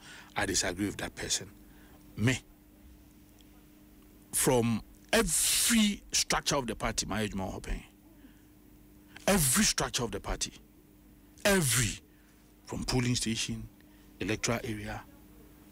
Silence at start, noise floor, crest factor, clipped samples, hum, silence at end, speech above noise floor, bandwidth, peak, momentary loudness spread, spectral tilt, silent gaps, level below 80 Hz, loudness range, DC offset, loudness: 0 s; -59 dBFS; 18 dB; under 0.1%; none; 0.3 s; 29 dB; 16 kHz; -16 dBFS; 15 LU; -3 dB/octave; none; -48 dBFS; 6 LU; under 0.1%; -30 LUFS